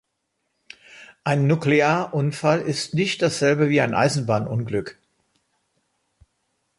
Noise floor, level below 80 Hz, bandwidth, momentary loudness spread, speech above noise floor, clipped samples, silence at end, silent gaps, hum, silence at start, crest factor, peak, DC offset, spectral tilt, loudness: -75 dBFS; -60 dBFS; 11.5 kHz; 10 LU; 55 dB; under 0.1%; 1.85 s; none; none; 0.95 s; 18 dB; -4 dBFS; under 0.1%; -5.5 dB/octave; -21 LUFS